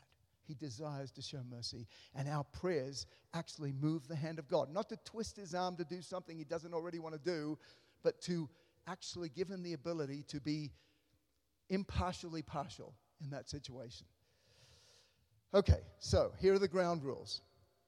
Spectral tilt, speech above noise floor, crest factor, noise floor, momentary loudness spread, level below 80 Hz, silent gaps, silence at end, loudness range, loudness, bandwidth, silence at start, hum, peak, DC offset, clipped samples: -6 dB/octave; 42 dB; 24 dB; -82 dBFS; 15 LU; -56 dBFS; none; 0.5 s; 8 LU; -41 LUFS; 12 kHz; 0.5 s; none; -18 dBFS; under 0.1%; under 0.1%